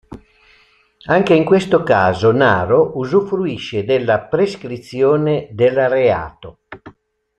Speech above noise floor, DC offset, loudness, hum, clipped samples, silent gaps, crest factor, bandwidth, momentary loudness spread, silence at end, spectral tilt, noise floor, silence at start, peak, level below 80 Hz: 38 dB; under 0.1%; -15 LUFS; none; under 0.1%; none; 16 dB; 9 kHz; 9 LU; 0.5 s; -7 dB/octave; -53 dBFS; 0.1 s; 0 dBFS; -50 dBFS